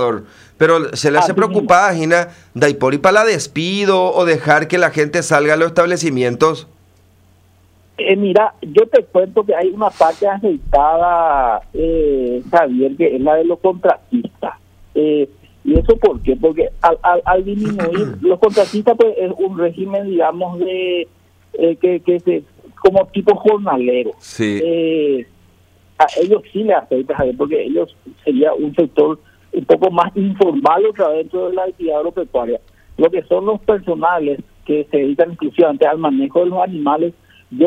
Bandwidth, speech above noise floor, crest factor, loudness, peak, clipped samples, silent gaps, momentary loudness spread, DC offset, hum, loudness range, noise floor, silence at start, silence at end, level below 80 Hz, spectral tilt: 12 kHz; 36 dB; 14 dB; -15 LUFS; 0 dBFS; under 0.1%; none; 8 LU; under 0.1%; none; 4 LU; -50 dBFS; 0 s; 0 s; -36 dBFS; -5.5 dB/octave